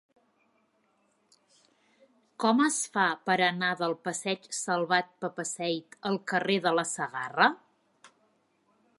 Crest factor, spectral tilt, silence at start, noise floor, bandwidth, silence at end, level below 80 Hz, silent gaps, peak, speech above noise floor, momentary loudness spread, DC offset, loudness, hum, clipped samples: 24 dB; -3 dB/octave; 2.4 s; -71 dBFS; 11.5 kHz; 0.9 s; -84 dBFS; none; -8 dBFS; 42 dB; 8 LU; under 0.1%; -28 LUFS; none; under 0.1%